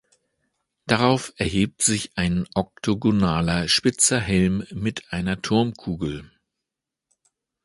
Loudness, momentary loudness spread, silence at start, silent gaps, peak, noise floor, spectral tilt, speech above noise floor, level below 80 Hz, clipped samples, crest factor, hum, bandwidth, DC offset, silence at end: -22 LUFS; 10 LU; 0.85 s; none; 0 dBFS; -85 dBFS; -4 dB/octave; 63 dB; -44 dBFS; under 0.1%; 22 dB; none; 11.5 kHz; under 0.1%; 1.4 s